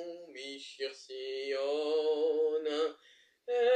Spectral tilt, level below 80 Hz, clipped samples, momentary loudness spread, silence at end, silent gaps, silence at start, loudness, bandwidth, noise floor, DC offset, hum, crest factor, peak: -2 dB/octave; under -90 dBFS; under 0.1%; 14 LU; 0 s; none; 0 s; -34 LUFS; 9.2 kHz; -64 dBFS; under 0.1%; none; 16 dB; -18 dBFS